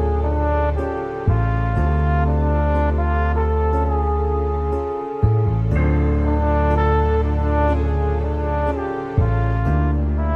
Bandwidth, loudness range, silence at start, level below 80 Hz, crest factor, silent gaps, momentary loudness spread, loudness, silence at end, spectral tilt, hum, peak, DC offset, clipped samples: 4.2 kHz; 1 LU; 0 s; -22 dBFS; 14 dB; none; 4 LU; -20 LUFS; 0 s; -10 dB/octave; none; -4 dBFS; under 0.1%; under 0.1%